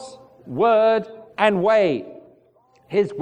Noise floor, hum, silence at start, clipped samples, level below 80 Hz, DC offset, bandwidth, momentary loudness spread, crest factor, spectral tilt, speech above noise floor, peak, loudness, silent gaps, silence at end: -57 dBFS; none; 0 s; under 0.1%; -66 dBFS; under 0.1%; 9.6 kHz; 18 LU; 20 dB; -6.5 dB/octave; 39 dB; -2 dBFS; -19 LUFS; none; 0 s